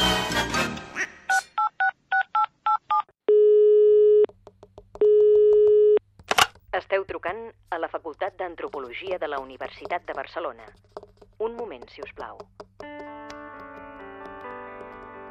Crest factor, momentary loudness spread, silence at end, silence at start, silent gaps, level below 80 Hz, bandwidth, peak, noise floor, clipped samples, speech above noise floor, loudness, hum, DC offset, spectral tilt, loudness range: 18 dB; 23 LU; 0 s; 0 s; none; -52 dBFS; 14.5 kHz; -6 dBFS; -51 dBFS; under 0.1%; 18 dB; -23 LUFS; none; under 0.1%; -3 dB/octave; 19 LU